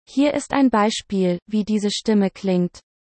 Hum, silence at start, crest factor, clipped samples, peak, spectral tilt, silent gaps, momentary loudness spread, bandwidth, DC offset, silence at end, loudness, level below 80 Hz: none; 0.1 s; 16 dB; under 0.1%; -4 dBFS; -5.5 dB/octave; 1.42-1.46 s; 5 LU; 8.8 kHz; under 0.1%; 0.35 s; -20 LUFS; -56 dBFS